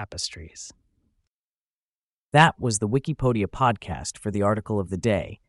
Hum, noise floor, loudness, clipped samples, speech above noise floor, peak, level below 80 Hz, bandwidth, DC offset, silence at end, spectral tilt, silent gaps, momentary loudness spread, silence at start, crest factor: none; under -90 dBFS; -24 LUFS; under 0.1%; over 66 dB; -4 dBFS; -48 dBFS; 11.5 kHz; under 0.1%; 0.15 s; -5 dB/octave; 1.27-2.31 s; 16 LU; 0 s; 22 dB